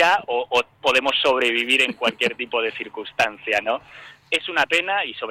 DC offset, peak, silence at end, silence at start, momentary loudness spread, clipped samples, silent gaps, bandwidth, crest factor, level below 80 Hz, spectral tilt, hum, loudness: under 0.1%; -6 dBFS; 0 s; 0 s; 8 LU; under 0.1%; none; 16.5 kHz; 16 dB; -62 dBFS; -2 dB/octave; none; -20 LUFS